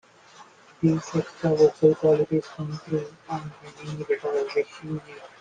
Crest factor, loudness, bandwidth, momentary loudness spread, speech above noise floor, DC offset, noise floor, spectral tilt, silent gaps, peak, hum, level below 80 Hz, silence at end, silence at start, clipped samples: 20 dB; -25 LUFS; 9.2 kHz; 16 LU; 26 dB; under 0.1%; -51 dBFS; -7.5 dB/octave; none; -6 dBFS; none; -62 dBFS; 0.15 s; 0.4 s; under 0.1%